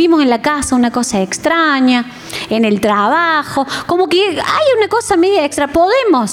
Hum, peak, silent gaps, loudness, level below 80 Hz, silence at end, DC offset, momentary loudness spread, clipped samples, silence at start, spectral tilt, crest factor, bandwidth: none; -2 dBFS; none; -13 LUFS; -44 dBFS; 0 s; under 0.1%; 5 LU; under 0.1%; 0 s; -3.5 dB/octave; 10 dB; 16 kHz